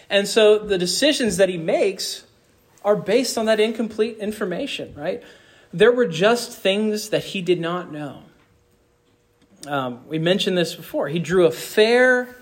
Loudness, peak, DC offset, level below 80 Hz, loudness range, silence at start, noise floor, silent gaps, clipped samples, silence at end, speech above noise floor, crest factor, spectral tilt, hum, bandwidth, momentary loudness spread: -20 LUFS; -4 dBFS; under 0.1%; -58 dBFS; 6 LU; 0.1 s; -61 dBFS; none; under 0.1%; 0.05 s; 41 dB; 16 dB; -4 dB/octave; none; 16.5 kHz; 13 LU